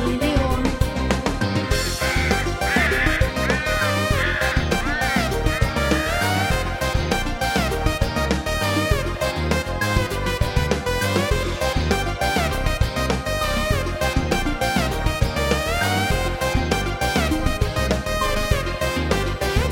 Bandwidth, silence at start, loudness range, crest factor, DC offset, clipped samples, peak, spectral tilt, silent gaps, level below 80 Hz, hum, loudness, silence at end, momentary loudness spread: 17 kHz; 0 s; 2 LU; 18 dB; under 0.1%; under 0.1%; -2 dBFS; -4.5 dB/octave; none; -28 dBFS; none; -21 LUFS; 0 s; 3 LU